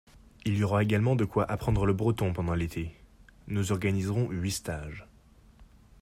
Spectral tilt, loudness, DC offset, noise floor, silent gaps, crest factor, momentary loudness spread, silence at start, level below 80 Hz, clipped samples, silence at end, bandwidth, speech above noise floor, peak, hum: -6.5 dB/octave; -29 LUFS; under 0.1%; -57 dBFS; none; 16 dB; 12 LU; 0.45 s; -46 dBFS; under 0.1%; 0.35 s; 15 kHz; 29 dB; -14 dBFS; none